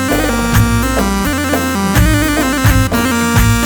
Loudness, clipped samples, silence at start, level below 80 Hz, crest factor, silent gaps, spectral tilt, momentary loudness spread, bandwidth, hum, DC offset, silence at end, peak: -13 LUFS; under 0.1%; 0 s; -20 dBFS; 12 dB; none; -5 dB/octave; 3 LU; over 20 kHz; none; under 0.1%; 0 s; 0 dBFS